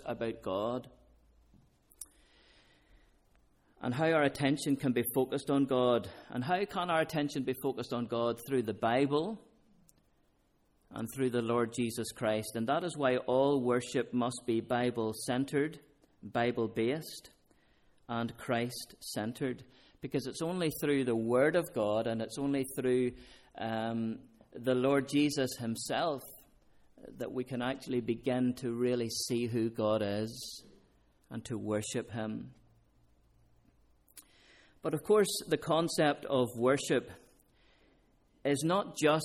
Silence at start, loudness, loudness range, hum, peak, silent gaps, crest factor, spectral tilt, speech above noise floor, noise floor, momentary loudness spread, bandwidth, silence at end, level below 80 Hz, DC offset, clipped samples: 0 s; -33 LUFS; 7 LU; none; -16 dBFS; none; 18 dB; -5 dB/octave; 39 dB; -71 dBFS; 13 LU; 16 kHz; 0 s; -68 dBFS; under 0.1%; under 0.1%